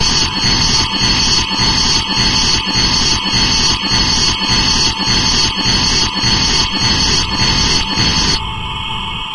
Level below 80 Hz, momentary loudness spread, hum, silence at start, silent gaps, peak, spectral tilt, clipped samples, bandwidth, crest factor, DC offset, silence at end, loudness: -24 dBFS; 2 LU; none; 0 s; none; 0 dBFS; -2 dB/octave; under 0.1%; 11.5 kHz; 12 dB; 1%; 0 s; -11 LUFS